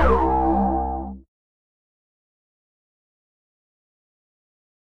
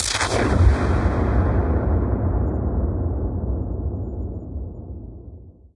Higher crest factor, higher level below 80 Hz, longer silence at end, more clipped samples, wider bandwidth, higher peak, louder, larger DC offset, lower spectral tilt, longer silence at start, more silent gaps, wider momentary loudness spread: about the same, 20 dB vs 18 dB; second, -34 dBFS vs -26 dBFS; first, 3.5 s vs 0.25 s; neither; second, 4.9 kHz vs 11.5 kHz; about the same, -6 dBFS vs -4 dBFS; about the same, -21 LUFS vs -22 LUFS; neither; first, -9.5 dB/octave vs -5.5 dB/octave; about the same, 0 s vs 0 s; neither; second, 13 LU vs 18 LU